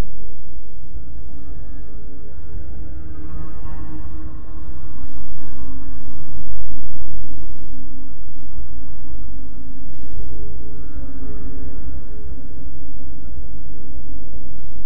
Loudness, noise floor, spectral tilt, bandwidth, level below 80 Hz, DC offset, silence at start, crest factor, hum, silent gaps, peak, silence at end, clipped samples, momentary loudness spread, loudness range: -37 LUFS; -36 dBFS; -10.5 dB/octave; 4 kHz; -36 dBFS; 40%; 0 s; 10 dB; none; none; 0 dBFS; 0 s; under 0.1%; 5 LU; 2 LU